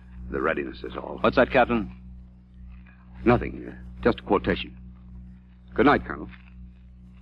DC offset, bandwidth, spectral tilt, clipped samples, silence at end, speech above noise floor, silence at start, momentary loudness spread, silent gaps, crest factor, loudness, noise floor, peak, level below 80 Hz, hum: under 0.1%; 5.8 kHz; -8.5 dB/octave; under 0.1%; 0 s; 23 dB; 0.05 s; 25 LU; none; 20 dB; -25 LUFS; -47 dBFS; -6 dBFS; -42 dBFS; 60 Hz at -50 dBFS